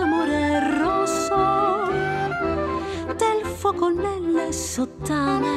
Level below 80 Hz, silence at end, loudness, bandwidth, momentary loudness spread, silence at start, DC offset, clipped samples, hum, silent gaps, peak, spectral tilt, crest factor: -46 dBFS; 0 s; -23 LUFS; 15 kHz; 5 LU; 0 s; under 0.1%; under 0.1%; none; none; -8 dBFS; -5 dB/octave; 14 dB